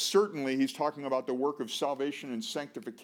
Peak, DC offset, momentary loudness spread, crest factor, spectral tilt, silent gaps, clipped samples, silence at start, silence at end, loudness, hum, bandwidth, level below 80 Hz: -14 dBFS; under 0.1%; 8 LU; 18 dB; -3.5 dB/octave; none; under 0.1%; 0 s; 0 s; -32 LUFS; none; 18.5 kHz; under -90 dBFS